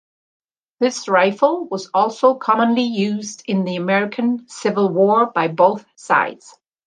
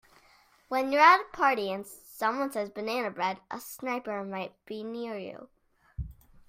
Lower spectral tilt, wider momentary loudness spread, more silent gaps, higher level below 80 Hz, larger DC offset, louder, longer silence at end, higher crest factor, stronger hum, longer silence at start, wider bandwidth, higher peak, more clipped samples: about the same, -5.5 dB/octave vs -4.5 dB/octave; second, 7 LU vs 22 LU; neither; second, -72 dBFS vs -54 dBFS; neither; first, -18 LUFS vs -28 LUFS; first, 0.5 s vs 0.35 s; second, 16 dB vs 22 dB; neither; about the same, 0.8 s vs 0.7 s; second, 9.6 kHz vs 16 kHz; first, -2 dBFS vs -8 dBFS; neither